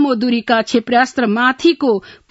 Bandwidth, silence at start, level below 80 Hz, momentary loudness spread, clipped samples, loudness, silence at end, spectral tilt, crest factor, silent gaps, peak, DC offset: 8 kHz; 0 s; -58 dBFS; 4 LU; under 0.1%; -15 LUFS; 0.2 s; -4.5 dB/octave; 14 dB; none; 0 dBFS; under 0.1%